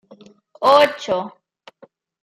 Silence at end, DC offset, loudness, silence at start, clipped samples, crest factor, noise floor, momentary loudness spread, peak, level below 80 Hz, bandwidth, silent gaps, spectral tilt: 0.95 s; under 0.1%; -17 LUFS; 0.6 s; under 0.1%; 20 dB; -51 dBFS; 12 LU; -2 dBFS; -64 dBFS; 15.5 kHz; none; -3.5 dB/octave